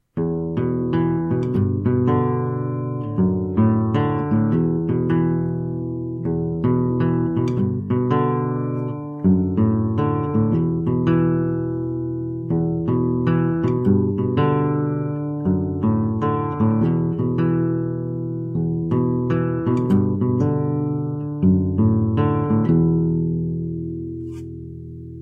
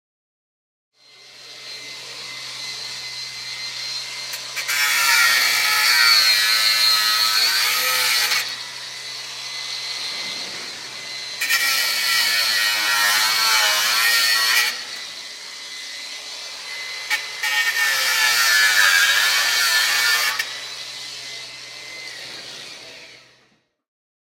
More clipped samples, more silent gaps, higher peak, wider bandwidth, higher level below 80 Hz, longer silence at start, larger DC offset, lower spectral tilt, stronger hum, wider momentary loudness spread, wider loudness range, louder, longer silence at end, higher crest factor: neither; neither; second, -6 dBFS vs -2 dBFS; second, 4.8 kHz vs 16.5 kHz; first, -46 dBFS vs -74 dBFS; second, 0.15 s vs 1.2 s; neither; first, -11 dB/octave vs 3 dB/octave; neither; second, 8 LU vs 18 LU; second, 2 LU vs 15 LU; second, -21 LUFS vs -17 LUFS; second, 0 s vs 1.2 s; about the same, 14 dB vs 18 dB